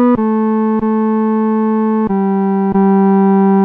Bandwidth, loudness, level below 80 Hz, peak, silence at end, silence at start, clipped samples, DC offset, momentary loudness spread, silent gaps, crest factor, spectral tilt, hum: 3.3 kHz; -13 LUFS; -48 dBFS; -4 dBFS; 0 s; 0 s; under 0.1%; under 0.1%; 4 LU; none; 8 dB; -12 dB/octave; none